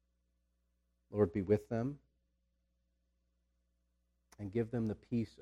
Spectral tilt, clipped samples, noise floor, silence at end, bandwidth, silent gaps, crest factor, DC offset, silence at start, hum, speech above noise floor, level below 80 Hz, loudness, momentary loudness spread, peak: -9.5 dB/octave; under 0.1%; -80 dBFS; 0.15 s; 11 kHz; none; 24 dB; under 0.1%; 1.1 s; 60 Hz at -70 dBFS; 44 dB; -66 dBFS; -37 LUFS; 10 LU; -16 dBFS